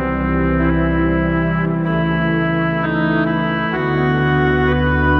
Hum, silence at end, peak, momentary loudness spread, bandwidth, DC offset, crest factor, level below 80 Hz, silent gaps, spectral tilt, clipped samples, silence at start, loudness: none; 0 s; -4 dBFS; 3 LU; 5.4 kHz; under 0.1%; 12 dB; -28 dBFS; none; -9.5 dB/octave; under 0.1%; 0 s; -17 LUFS